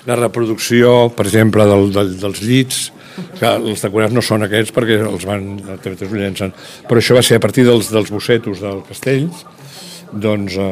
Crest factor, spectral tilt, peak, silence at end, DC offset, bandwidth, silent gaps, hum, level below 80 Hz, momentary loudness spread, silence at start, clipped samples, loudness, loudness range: 14 dB; -5 dB/octave; 0 dBFS; 0 s; under 0.1%; 16 kHz; none; none; -50 dBFS; 16 LU; 0.05 s; under 0.1%; -14 LUFS; 4 LU